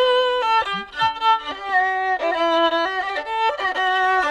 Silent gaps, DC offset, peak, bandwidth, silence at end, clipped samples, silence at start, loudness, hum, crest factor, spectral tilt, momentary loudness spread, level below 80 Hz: none; under 0.1%; -8 dBFS; 11.5 kHz; 0 s; under 0.1%; 0 s; -20 LUFS; none; 12 dB; -3 dB/octave; 5 LU; -54 dBFS